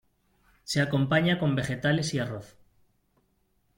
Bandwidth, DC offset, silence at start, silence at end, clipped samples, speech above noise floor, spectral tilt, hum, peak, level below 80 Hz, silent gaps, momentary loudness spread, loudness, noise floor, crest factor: 16.5 kHz; under 0.1%; 0.65 s; 1.3 s; under 0.1%; 44 dB; -5.5 dB/octave; none; -10 dBFS; -58 dBFS; none; 12 LU; -27 LUFS; -71 dBFS; 20 dB